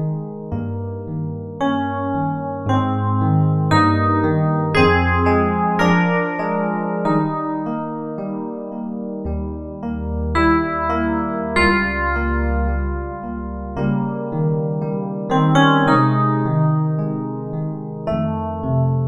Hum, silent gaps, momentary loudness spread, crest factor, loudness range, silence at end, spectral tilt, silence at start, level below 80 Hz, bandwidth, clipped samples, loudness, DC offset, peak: none; none; 12 LU; 18 dB; 6 LU; 0 s; -8 dB/octave; 0 s; -34 dBFS; 10 kHz; under 0.1%; -19 LUFS; under 0.1%; -2 dBFS